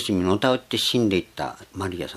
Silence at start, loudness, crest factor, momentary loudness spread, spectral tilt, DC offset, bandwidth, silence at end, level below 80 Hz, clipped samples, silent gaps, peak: 0 s; -23 LUFS; 20 dB; 12 LU; -5 dB/octave; under 0.1%; 14.5 kHz; 0 s; -54 dBFS; under 0.1%; none; -4 dBFS